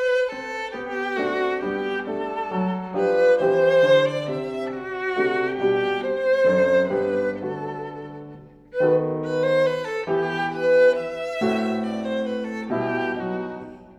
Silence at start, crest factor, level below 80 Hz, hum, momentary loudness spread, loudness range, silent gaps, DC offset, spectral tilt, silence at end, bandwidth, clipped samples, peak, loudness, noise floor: 0 s; 16 dB; -60 dBFS; none; 12 LU; 4 LU; none; under 0.1%; -6.5 dB/octave; 0.05 s; 9 kHz; under 0.1%; -6 dBFS; -23 LUFS; -43 dBFS